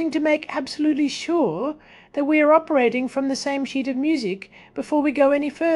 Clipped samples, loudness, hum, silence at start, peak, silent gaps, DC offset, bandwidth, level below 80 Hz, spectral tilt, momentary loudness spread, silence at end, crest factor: under 0.1%; -21 LUFS; none; 0 s; -4 dBFS; none; under 0.1%; 11.5 kHz; -62 dBFS; -4.5 dB/octave; 12 LU; 0 s; 16 dB